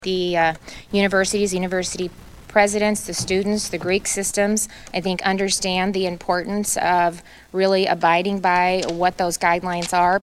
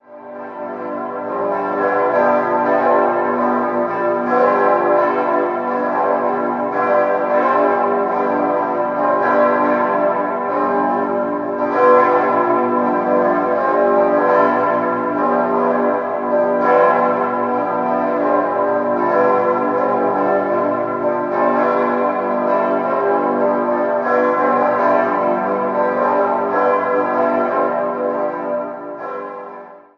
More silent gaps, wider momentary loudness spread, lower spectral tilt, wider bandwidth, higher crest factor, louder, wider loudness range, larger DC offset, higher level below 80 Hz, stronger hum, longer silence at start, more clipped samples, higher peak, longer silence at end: neither; about the same, 6 LU vs 6 LU; second, -3.5 dB/octave vs -8 dB/octave; first, 15.5 kHz vs 6.2 kHz; about the same, 18 dB vs 16 dB; second, -20 LUFS vs -16 LUFS; about the same, 2 LU vs 2 LU; neither; first, -48 dBFS vs -60 dBFS; neither; about the same, 0 s vs 0.1 s; neither; about the same, -2 dBFS vs -2 dBFS; second, 0.05 s vs 0.2 s